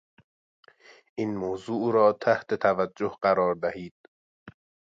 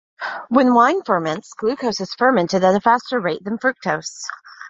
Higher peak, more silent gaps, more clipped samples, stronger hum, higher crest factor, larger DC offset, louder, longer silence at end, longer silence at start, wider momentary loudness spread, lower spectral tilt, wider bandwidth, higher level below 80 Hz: second, -10 dBFS vs -2 dBFS; first, 3.91-4.46 s vs none; neither; neither; about the same, 18 dB vs 18 dB; neither; second, -26 LUFS vs -18 LUFS; first, 0.35 s vs 0 s; first, 1.15 s vs 0.2 s; about the same, 11 LU vs 13 LU; first, -7 dB/octave vs -5 dB/octave; about the same, 7.8 kHz vs 7.8 kHz; about the same, -64 dBFS vs -62 dBFS